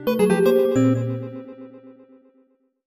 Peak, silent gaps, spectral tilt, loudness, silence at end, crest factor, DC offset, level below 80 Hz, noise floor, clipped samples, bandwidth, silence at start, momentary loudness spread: -6 dBFS; none; -7 dB/octave; -19 LUFS; 0.95 s; 16 dB; under 0.1%; -62 dBFS; -62 dBFS; under 0.1%; 15 kHz; 0 s; 22 LU